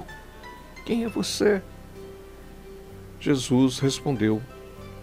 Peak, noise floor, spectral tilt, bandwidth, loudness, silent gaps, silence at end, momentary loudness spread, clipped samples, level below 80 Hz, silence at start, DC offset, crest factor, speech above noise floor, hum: -10 dBFS; -43 dBFS; -5.5 dB/octave; 16 kHz; -25 LUFS; none; 0 s; 22 LU; under 0.1%; -48 dBFS; 0 s; under 0.1%; 16 dB; 20 dB; none